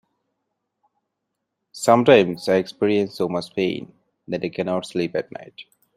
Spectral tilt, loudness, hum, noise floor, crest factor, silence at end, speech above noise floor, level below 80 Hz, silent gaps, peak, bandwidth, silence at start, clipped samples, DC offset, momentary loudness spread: -5.5 dB/octave; -21 LUFS; none; -79 dBFS; 20 dB; 0.35 s; 59 dB; -64 dBFS; none; -2 dBFS; 15.5 kHz; 1.75 s; under 0.1%; under 0.1%; 16 LU